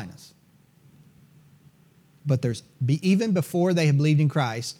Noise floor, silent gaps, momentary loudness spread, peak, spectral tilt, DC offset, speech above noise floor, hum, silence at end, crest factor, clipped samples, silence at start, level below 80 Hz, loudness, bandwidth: -58 dBFS; none; 9 LU; -10 dBFS; -7 dB/octave; under 0.1%; 36 dB; none; 0.05 s; 14 dB; under 0.1%; 0 s; -70 dBFS; -23 LUFS; 15 kHz